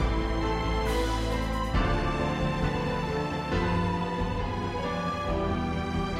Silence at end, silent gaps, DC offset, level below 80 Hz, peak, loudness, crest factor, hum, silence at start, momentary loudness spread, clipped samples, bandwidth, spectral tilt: 0 s; none; under 0.1%; -34 dBFS; -14 dBFS; -29 LUFS; 12 dB; none; 0 s; 3 LU; under 0.1%; 14 kHz; -6.5 dB/octave